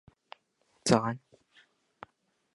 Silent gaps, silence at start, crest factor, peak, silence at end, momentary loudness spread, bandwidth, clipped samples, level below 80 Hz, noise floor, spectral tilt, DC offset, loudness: none; 0.85 s; 28 dB; -8 dBFS; 1.4 s; 26 LU; 11.5 kHz; under 0.1%; -66 dBFS; -72 dBFS; -5 dB/octave; under 0.1%; -29 LUFS